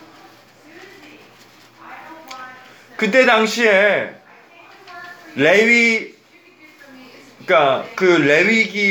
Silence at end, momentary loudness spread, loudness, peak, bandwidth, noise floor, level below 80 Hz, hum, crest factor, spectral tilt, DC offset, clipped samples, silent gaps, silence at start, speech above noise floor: 0 s; 24 LU; -14 LUFS; 0 dBFS; over 20 kHz; -48 dBFS; -72 dBFS; none; 18 dB; -4 dB/octave; under 0.1%; under 0.1%; none; 1.85 s; 34 dB